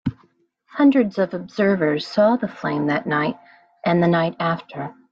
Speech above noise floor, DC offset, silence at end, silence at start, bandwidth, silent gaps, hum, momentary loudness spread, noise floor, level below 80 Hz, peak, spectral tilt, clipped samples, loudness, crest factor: 41 dB; under 0.1%; 0.2 s; 0.05 s; 7.2 kHz; none; none; 12 LU; -60 dBFS; -58 dBFS; -6 dBFS; -8 dB/octave; under 0.1%; -20 LUFS; 16 dB